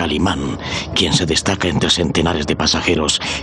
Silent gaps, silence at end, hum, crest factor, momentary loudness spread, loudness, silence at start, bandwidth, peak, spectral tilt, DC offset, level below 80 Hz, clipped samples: none; 0 s; none; 14 dB; 4 LU; -16 LUFS; 0 s; 12 kHz; -2 dBFS; -3.5 dB/octave; under 0.1%; -36 dBFS; under 0.1%